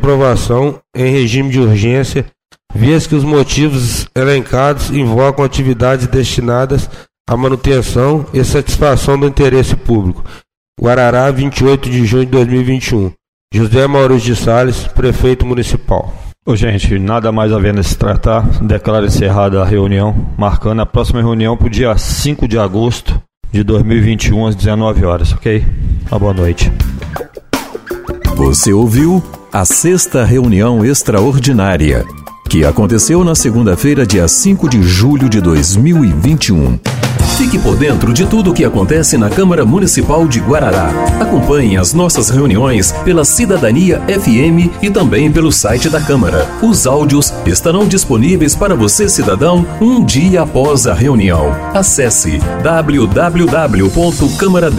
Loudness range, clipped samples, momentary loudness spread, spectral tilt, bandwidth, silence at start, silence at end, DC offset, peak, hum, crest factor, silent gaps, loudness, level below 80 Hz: 3 LU; under 0.1%; 6 LU; -5.5 dB/octave; 16.5 kHz; 0 s; 0 s; under 0.1%; 0 dBFS; none; 10 dB; 7.20-7.25 s, 10.57-10.73 s, 13.28-13.48 s, 23.37-23.41 s; -11 LUFS; -20 dBFS